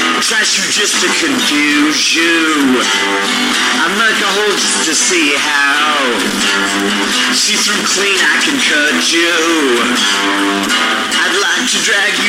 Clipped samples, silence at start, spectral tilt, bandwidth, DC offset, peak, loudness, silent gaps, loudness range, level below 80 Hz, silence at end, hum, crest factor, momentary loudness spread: under 0.1%; 0 s; -1 dB/octave; 16.5 kHz; under 0.1%; -2 dBFS; -11 LUFS; none; 1 LU; -54 dBFS; 0 s; none; 10 dB; 2 LU